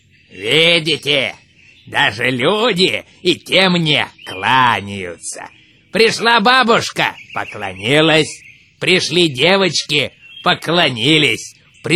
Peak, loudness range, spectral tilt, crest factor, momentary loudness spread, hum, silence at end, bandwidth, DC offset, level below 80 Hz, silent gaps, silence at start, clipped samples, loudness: 0 dBFS; 1 LU; -3.5 dB/octave; 16 dB; 14 LU; none; 0 s; 16.5 kHz; under 0.1%; -56 dBFS; none; 0.35 s; under 0.1%; -14 LUFS